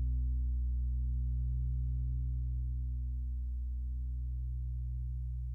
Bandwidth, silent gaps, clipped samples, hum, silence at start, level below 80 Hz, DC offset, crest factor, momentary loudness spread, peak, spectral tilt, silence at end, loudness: 0.3 kHz; none; under 0.1%; none; 0 s; -36 dBFS; under 0.1%; 8 dB; 4 LU; -28 dBFS; -11.5 dB/octave; 0 s; -38 LUFS